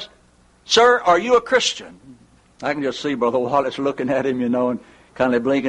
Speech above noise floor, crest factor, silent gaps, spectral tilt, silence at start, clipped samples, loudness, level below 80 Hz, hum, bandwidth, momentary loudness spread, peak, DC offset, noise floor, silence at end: 36 dB; 16 dB; none; -3.5 dB/octave; 0 s; under 0.1%; -19 LUFS; -56 dBFS; none; 11 kHz; 11 LU; -4 dBFS; under 0.1%; -55 dBFS; 0 s